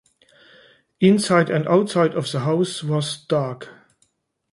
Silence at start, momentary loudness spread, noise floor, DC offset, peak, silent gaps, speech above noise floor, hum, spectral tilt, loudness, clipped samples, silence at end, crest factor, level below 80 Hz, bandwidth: 1 s; 8 LU; -67 dBFS; under 0.1%; -4 dBFS; none; 47 dB; none; -6 dB/octave; -20 LUFS; under 0.1%; 0.8 s; 18 dB; -64 dBFS; 11.5 kHz